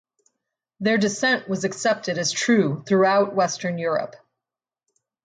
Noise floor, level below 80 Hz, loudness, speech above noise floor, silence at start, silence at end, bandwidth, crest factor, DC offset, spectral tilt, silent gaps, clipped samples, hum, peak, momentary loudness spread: -89 dBFS; -70 dBFS; -22 LUFS; 68 dB; 0.8 s; 1.1 s; 9.6 kHz; 16 dB; under 0.1%; -4 dB/octave; none; under 0.1%; none; -8 dBFS; 8 LU